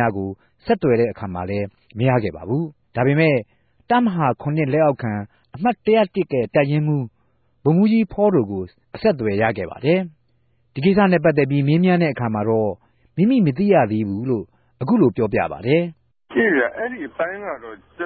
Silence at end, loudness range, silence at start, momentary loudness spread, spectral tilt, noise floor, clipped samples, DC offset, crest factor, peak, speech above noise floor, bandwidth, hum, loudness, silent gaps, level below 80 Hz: 0 s; 2 LU; 0 s; 13 LU; -12.5 dB/octave; -64 dBFS; under 0.1%; under 0.1%; 16 dB; -4 dBFS; 45 dB; 4.8 kHz; none; -20 LUFS; none; -50 dBFS